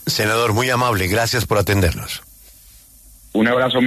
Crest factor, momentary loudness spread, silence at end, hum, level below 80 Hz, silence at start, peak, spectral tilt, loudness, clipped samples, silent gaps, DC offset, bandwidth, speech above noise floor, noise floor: 14 dB; 10 LU; 0 s; none; -38 dBFS; 0 s; -4 dBFS; -4.5 dB/octave; -18 LUFS; under 0.1%; none; under 0.1%; 14 kHz; 29 dB; -46 dBFS